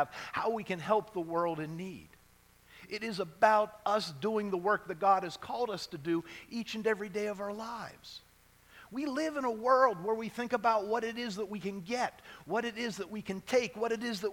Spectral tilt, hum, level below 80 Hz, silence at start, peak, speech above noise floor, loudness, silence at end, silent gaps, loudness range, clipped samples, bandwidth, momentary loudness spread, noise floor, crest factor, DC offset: -5 dB/octave; none; -70 dBFS; 0 s; -10 dBFS; 30 dB; -33 LUFS; 0 s; none; 6 LU; under 0.1%; 18 kHz; 12 LU; -63 dBFS; 24 dB; under 0.1%